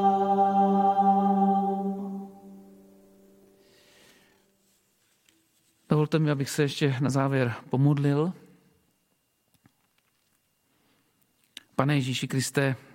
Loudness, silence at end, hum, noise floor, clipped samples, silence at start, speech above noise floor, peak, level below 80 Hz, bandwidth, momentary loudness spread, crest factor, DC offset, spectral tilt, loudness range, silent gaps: -25 LUFS; 0.15 s; none; -72 dBFS; under 0.1%; 0 s; 47 dB; -6 dBFS; -70 dBFS; 16.5 kHz; 13 LU; 22 dB; under 0.1%; -6.5 dB/octave; 11 LU; none